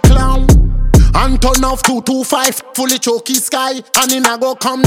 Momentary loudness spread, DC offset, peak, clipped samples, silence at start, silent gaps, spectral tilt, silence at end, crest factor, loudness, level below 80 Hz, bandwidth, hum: 5 LU; under 0.1%; 0 dBFS; under 0.1%; 0.05 s; none; -4 dB/octave; 0 s; 10 dB; -12 LUFS; -14 dBFS; 16.5 kHz; none